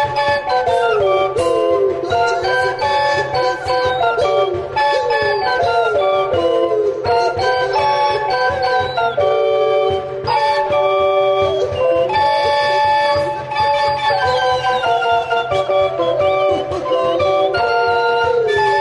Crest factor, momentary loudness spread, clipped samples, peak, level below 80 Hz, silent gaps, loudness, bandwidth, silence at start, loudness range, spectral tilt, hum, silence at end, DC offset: 12 dB; 3 LU; under 0.1%; -4 dBFS; -46 dBFS; none; -16 LUFS; 11.5 kHz; 0 s; 1 LU; -4.5 dB/octave; none; 0 s; under 0.1%